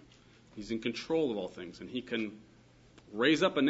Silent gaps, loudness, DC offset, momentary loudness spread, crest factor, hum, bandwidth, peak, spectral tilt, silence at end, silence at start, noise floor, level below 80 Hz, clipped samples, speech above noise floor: none; -33 LUFS; under 0.1%; 18 LU; 20 dB; none; 8 kHz; -14 dBFS; -5 dB/octave; 0 s; 0.55 s; -60 dBFS; -68 dBFS; under 0.1%; 28 dB